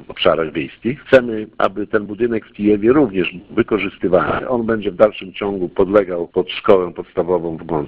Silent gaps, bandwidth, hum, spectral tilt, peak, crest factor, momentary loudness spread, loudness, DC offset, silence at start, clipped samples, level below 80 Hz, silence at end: none; 5.8 kHz; none; -8 dB/octave; 0 dBFS; 16 dB; 9 LU; -17 LUFS; under 0.1%; 0 s; under 0.1%; -46 dBFS; 0 s